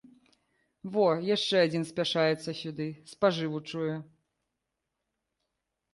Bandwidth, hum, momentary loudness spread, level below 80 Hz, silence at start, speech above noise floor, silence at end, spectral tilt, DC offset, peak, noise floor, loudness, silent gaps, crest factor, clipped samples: 11.5 kHz; none; 11 LU; -74 dBFS; 0.85 s; 56 dB; 1.9 s; -5.5 dB/octave; under 0.1%; -10 dBFS; -85 dBFS; -29 LUFS; none; 20 dB; under 0.1%